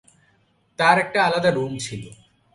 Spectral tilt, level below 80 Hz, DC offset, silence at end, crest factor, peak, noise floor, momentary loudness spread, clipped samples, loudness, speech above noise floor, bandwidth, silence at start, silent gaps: -4.5 dB/octave; -58 dBFS; under 0.1%; 0.4 s; 22 dB; -2 dBFS; -63 dBFS; 17 LU; under 0.1%; -20 LUFS; 42 dB; 11.5 kHz; 0.8 s; none